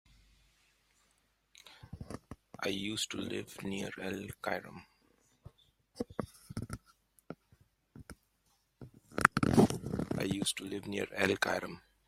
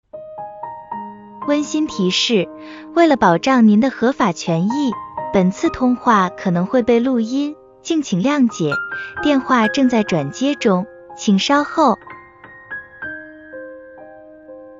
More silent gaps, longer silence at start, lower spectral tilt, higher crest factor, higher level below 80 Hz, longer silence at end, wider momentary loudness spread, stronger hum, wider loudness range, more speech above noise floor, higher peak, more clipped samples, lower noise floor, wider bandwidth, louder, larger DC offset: neither; first, 1.65 s vs 0.15 s; about the same, -4.5 dB/octave vs -5.5 dB/octave; first, 36 dB vs 18 dB; second, -60 dBFS vs -52 dBFS; first, 0.3 s vs 0.05 s; first, 26 LU vs 18 LU; neither; first, 16 LU vs 4 LU; first, 38 dB vs 26 dB; about the same, -2 dBFS vs 0 dBFS; neither; first, -75 dBFS vs -42 dBFS; first, 16 kHz vs 7.6 kHz; second, -35 LUFS vs -17 LUFS; neither